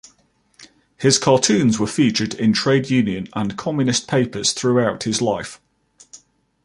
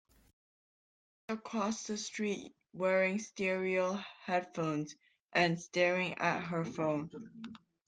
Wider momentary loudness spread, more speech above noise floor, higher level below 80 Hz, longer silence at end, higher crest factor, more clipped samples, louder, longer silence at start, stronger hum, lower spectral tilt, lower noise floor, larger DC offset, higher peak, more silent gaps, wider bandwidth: second, 9 LU vs 15 LU; second, 42 dB vs over 55 dB; first, -54 dBFS vs -76 dBFS; first, 0.5 s vs 0.3 s; about the same, 18 dB vs 20 dB; neither; first, -18 LUFS vs -35 LUFS; second, 0.6 s vs 1.3 s; neither; about the same, -4.5 dB/octave vs -4.5 dB/octave; second, -60 dBFS vs under -90 dBFS; neither; first, -2 dBFS vs -16 dBFS; second, none vs 5.21-5.29 s; first, 11.5 kHz vs 9.6 kHz